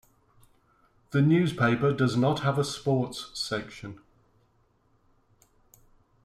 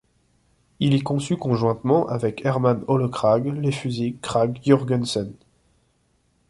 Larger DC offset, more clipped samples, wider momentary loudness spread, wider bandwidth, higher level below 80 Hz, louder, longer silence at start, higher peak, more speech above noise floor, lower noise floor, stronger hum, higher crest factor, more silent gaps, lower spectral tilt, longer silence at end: neither; neither; first, 11 LU vs 6 LU; first, 13.5 kHz vs 11.5 kHz; about the same, -60 dBFS vs -56 dBFS; second, -26 LUFS vs -22 LUFS; first, 1.1 s vs 0.8 s; second, -12 dBFS vs -2 dBFS; about the same, 41 dB vs 44 dB; about the same, -67 dBFS vs -65 dBFS; neither; about the same, 16 dB vs 20 dB; neither; about the same, -6.5 dB/octave vs -7 dB/octave; first, 2.25 s vs 1.15 s